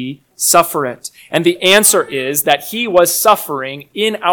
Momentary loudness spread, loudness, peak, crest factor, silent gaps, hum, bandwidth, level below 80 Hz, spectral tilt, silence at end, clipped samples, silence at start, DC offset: 14 LU; -13 LUFS; 0 dBFS; 14 dB; none; none; over 20 kHz; -56 dBFS; -2 dB/octave; 0 s; 0.4%; 0 s; under 0.1%